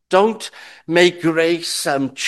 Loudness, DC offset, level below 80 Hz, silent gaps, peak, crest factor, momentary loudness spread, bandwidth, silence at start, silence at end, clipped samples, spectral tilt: -17 LUFS; under 0.1%; -66 dBFS; none; 0 dBFS; 18 dB; 15 LU; 12.5 kHz; 0.1 s; 0 s; under 0.1%; -4 dB/octave